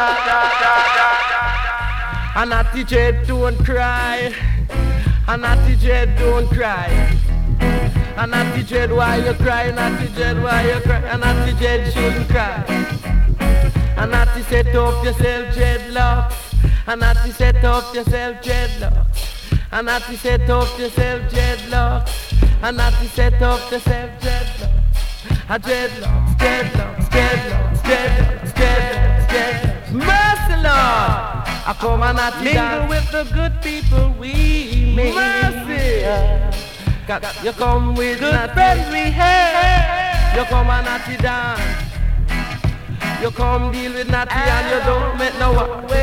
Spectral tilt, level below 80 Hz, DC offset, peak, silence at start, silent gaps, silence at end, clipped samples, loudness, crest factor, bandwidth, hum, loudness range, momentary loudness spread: -5.5 dB/octave; -18 dBFS; under 0.1%; 0 dBFS; 0 s; none; 0 s; under 0.1%; -17 LUFS; 16 dB; 15.5 kHz; none; 4 LU; 7 LU